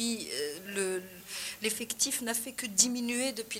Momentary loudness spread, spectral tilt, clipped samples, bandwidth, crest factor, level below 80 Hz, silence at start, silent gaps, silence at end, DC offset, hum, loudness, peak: 11 LU; -1 dB/octave; under 0.1%; 16.5 kHz; 24 dB; -70 dBFS; 0 s; none; 0 s; under 0.1%; none; -31 LUFS; -10 dBFS